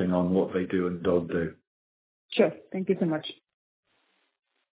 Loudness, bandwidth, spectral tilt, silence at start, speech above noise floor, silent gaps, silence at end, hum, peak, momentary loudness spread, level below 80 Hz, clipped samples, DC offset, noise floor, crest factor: -28 LUFS; 4 kHz; -11 dB/octave; 0 s; 45 dB; 1.67-2.29 s; 1.45 s; none; -8 dBFS; 8 LU; -56 dBFS; under 0.1%; under 0.1%; -72 dBFS; 20 dB